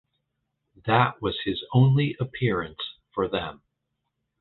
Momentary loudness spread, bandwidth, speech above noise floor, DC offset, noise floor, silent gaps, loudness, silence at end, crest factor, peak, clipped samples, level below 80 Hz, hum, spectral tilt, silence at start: 14 LU; 4.3 kHz; 56 dB; under 0.1%; -80 dBFS; none; -25 LUFS; 0.85 s; 20 dB; -6 dBFS; under 0.1%; -54 dBFS; none; -10 dB/octave; 0.85 s